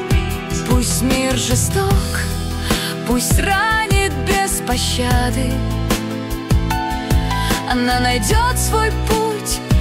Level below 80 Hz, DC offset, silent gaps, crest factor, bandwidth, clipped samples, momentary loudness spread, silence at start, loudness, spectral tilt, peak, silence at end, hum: -22 dBFS; under 0.1%; none; 14 dB; 16.5 kHz; under 0.1%; 5 LU; 0 s; -17 LUFS; -4 dB/octave; -4 dBFS; 0 s; none